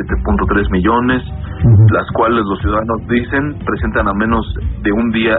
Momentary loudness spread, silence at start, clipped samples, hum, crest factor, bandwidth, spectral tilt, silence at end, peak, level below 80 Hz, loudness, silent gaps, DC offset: 8 LU; 0 s; under 0.1%; none; 12 dB; 4 kHz; -6.5 dB/octave; 0 s; 0 dBFS; -24 dBFS; -14 LUFS; none; under 0.1%